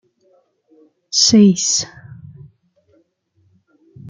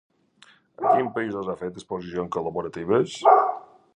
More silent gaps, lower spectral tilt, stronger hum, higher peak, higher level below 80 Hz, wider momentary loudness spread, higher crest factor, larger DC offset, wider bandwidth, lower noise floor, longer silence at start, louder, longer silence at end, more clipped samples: neither; second, -4 dB/octave vs -6 dB/octave; neither; about the same, -2 dBFS vs -4 dBFS; about the same, -60 dBFS vs -62 dBFS; second, 10 LU vs 14 LU; about the same, 18 dB vs 20 dB; neither; about the same, 9.6 kHz vs 10 kHz; first, -61 dBFS vs -57 dBFS; first, 1.15 s vs 0.8 s; first, -13 LUFS vs -24 LUFS; second, 0 s vs 0.35 s; neither